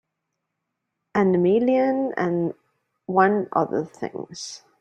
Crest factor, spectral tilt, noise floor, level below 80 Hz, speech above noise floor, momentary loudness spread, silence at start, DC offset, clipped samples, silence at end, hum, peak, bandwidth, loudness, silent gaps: 20 dB; -6.5 dB/octave; -80 dBFS; -66 dBFS; 59 dB; 15 LU; 1.15 s; under 0.1%; under 0.1%; 0.25 s; none; -4 dBFS; 9.2 kHz; -22 LUFS; none